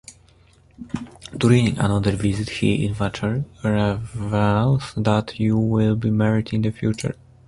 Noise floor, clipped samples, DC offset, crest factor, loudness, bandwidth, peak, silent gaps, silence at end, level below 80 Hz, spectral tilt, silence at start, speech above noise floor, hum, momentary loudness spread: -53 dBFS; under 0.1%; under 0.1%; 18 dB; -21 LUFS; 11.5 kHz; -2 dBFS; none; 0.35 s; -42 dBFS; -7 dB/octave; 0.1 s; 33 dB; none; 10 LU